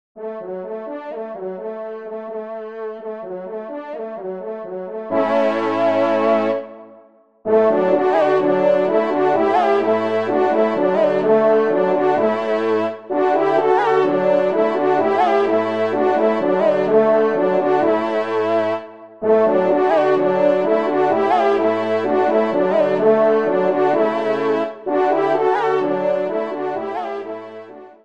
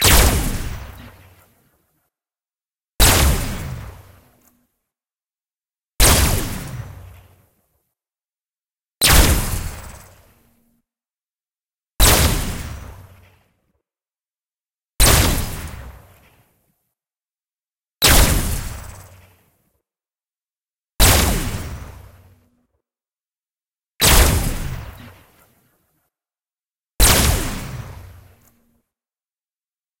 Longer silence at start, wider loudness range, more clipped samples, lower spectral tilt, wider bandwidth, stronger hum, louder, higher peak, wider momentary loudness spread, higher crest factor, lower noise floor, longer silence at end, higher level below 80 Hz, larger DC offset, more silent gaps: first, 0.15 s vs 0 s; first, 8 LU vs 1 LU; neither; first, -7 dB/octave vs -3 dB/octave; second, 7.8 kHz vs 16.5 kHz; neither; about the same, -17 LUFS vs -16 LUFS; about the same, -2 dBFS vs 0 dBFS; second, 14 LU vs 23 LU; about the same, 16 dB vs 20 dB; second, -49 dBFS vs under -90 dBFS; second, 0.15 s vs 1.95 s; second, -68 dBFS vs -26 dBFS; first, 0.3% vs under 0.1%; second, none vs 14.74-14.78 s, 26.71-26.79 s